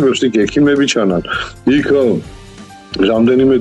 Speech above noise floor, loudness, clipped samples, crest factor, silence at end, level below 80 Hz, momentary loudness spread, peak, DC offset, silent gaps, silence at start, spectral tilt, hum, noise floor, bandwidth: 23 dB; -13 LUFS; under 0.1%; 10 dB; 0 s; -40 dBFS; 7 LU; -2 dBFS; under 0.1%; none; 0 s; -5.5 dB/octave; none; -35 dBFS; 9.4 kHz